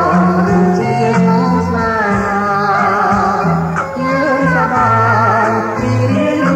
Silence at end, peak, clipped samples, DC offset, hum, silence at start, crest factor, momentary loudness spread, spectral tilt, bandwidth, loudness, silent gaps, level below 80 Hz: 0 s; -2 dBFS; under 0.1%; under 0.1%; none; 0 s; 10 dB; 4 LU; -7.5 dB/octave; 9 kHz; -13 LUFS; none; -38 dBFS